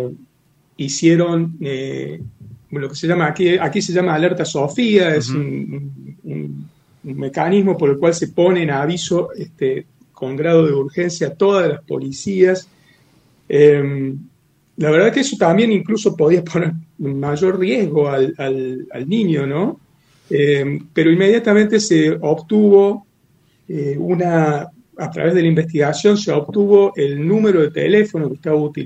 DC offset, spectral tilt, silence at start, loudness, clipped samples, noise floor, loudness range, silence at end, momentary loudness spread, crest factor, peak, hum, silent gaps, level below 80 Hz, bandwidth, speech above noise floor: under 0.1%; -6 dB/octave; 0 s; -16 LUFS; under 0.1%; -57 dBFS; 4 LU; 0 s; 14 LU; 16 dB; 0 dBFS; none; none; -60 dBFS; 9 kHz; 41 dB